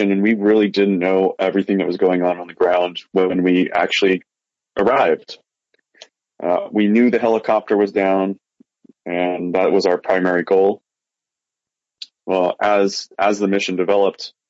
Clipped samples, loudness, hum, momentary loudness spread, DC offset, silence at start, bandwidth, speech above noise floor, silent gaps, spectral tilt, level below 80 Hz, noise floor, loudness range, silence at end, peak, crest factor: under 0.1%; -17 LUFS; none; 8 LU; under 0.1%; 0 s; 8 kHz; 69 dB; none; -6 dB/octave; -64 dBFS; -86 dBFS; 3 LU; 0.2 s; -4 dBFS; 14 dB